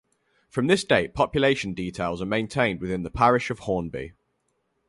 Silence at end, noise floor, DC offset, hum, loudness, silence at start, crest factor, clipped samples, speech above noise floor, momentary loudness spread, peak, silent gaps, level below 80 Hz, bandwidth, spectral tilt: 0.8 s; -73 dBFS; under 0.1%; none; -24 LUFS; 0.55 s; 20 dB; under 0.1%; 49 dB; 10 LU; -6 dBFS; none; -48 dBFS; 11.5 kHz; -5.5 dB/octave